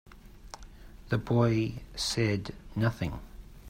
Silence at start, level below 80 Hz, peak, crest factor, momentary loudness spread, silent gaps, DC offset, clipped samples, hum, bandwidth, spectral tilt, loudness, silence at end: 0.1 s; -48 dBFS; -12 dBFS; 20 dB; 22 LU; none; under 0.1%; under 0.1%; none; 15.5 kHz; -5.5 dB/octave; -30 LUFS; 0 s